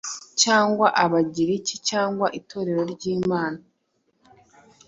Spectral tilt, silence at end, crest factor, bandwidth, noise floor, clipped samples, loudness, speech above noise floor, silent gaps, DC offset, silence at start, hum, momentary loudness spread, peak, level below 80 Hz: -3.5 dB/octave; 1.3 s; 22 dB; 8 kHz; -70 dBFS; under 0.1%; -22 LUFS; 48 dB; none; under 0.1%; 0.05 s; none; 10 LU; -2 dBFS; -64 dBFS